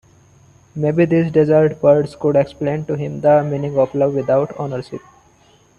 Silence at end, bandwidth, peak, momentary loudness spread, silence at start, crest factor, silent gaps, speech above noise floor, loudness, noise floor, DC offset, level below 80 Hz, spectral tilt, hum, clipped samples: 0.8 s; 9.8 kHz; 0 dBFS; 12 LU; 0.75 s; 16 dB; none; 36 dB; -17 LUFS; -52 dBFS; under 0.1%; -52 dBFS; -9 dB/octave; none; under 0.1%